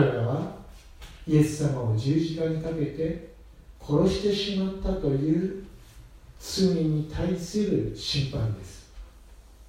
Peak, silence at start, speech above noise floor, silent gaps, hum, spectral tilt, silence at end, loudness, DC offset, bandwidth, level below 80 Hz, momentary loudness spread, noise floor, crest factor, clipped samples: -8 dBFS; 0 s; 24 dB; none; none; -6.5 dB/octave; 0 s; -27 LUFS; under 0.1%; 16 kHz; -44 dBFS; 18 LU; -50 dBFS; 20 dB; under 0.1%